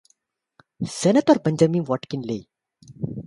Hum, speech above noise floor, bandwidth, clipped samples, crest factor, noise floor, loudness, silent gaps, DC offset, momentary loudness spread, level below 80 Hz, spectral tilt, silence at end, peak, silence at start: none; 47 dB; 11.5 kHz; under 0.1%; 20 dB; -67 dBFS; -22 LUFS; none; under 0.1%; 15 LU; -60 dBFS; -6.5 dB/octave; 0 s; -4 dBFS; 0.8 s